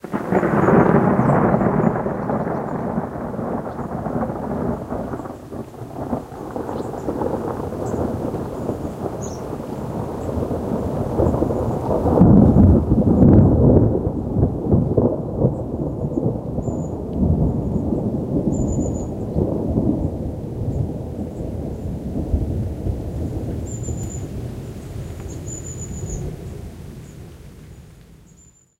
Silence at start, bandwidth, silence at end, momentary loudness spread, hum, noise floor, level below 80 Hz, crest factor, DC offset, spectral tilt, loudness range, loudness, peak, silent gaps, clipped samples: 0.05 s; 15.5 kHz; 0.65 s; 17 LU; none; -50 dBFS; -32 dBFS; 20 dB; under 0.1%; -9 dB/octave; 14 LU; -21 LUFS; 0 dBFS; none; under 0.1%